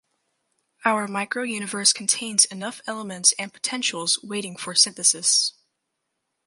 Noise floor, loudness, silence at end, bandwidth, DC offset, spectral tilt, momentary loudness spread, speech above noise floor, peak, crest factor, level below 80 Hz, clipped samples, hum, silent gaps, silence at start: -79 dBFS; -21 LUFS; 0.95 s; 12 kHz; under 0.1%; -0.5 dB/octave; 12 LU; 55 dB; -2 dBFS; 24 dB; -78 dBFS; under 0.1%; none; none; 0.85 s